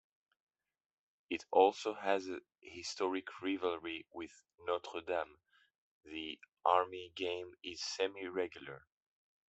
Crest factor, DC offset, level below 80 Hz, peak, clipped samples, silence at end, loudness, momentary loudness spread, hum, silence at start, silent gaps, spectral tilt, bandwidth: 26 dB; under 0.1%; -80 dBFS; -14 dBFS; under 0.1%; 0.7 s; -38 LUFS; 17 LU; none; 1.3 s; 5.78-6.01 s; -3 dB/octave; 8.2 kHz